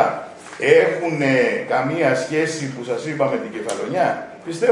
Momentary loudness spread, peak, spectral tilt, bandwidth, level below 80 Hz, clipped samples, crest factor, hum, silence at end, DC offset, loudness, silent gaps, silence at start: 12 LU; 0 dBFS; -5 dB/octave; 11 kHz; -68 dBFS; under 0.1%; 18 dB; none; 0 s; under 0.1%; -20 LUFS; none; 0 s